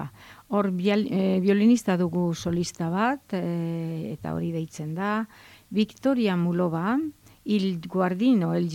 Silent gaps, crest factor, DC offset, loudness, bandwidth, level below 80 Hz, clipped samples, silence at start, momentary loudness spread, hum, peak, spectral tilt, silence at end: none; 14 dB; under 0.1%; -26 LUFS; 15.5 kHz; -62 dBFS; under 0.1%; 0 s; 10 LU; none; -10 dBFS; -7 dB/octave; 0 s